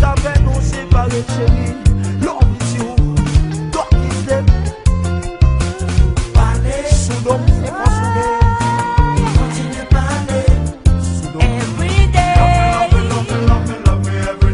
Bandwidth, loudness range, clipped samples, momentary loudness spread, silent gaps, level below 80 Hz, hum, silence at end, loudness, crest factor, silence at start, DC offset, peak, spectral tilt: 11 kHz; 2 LU; under 0.1%; 5 LU; none; -16 dBFS; none; 0 s; -15 LUFS; 12 dB; 0 s; under 0.1%; 0 dBFS; -6 dB/octave